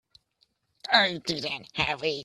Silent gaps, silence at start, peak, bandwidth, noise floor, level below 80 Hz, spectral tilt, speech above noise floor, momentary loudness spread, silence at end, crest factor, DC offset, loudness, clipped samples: none; 0.85 s; -6 dBFS; 13.5 kHz; -71 dBFS; -58 dBFS; -3 dB/octave; 43 dB; 10 LU; 0 s; 24 dB; under 0.1%; -26 LUFS; under 0.1%